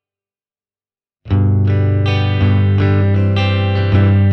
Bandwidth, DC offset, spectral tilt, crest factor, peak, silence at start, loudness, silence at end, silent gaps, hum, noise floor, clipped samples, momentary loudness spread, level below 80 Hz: 5.8 kHz; under 0.1%; -9 dB/octave; 12 dB; -2 dBFS; 1.25 s; -14 LUFS; 0 s; none; none; under -90 dBFS; under 0.1%; 3 LU; -38 dBFS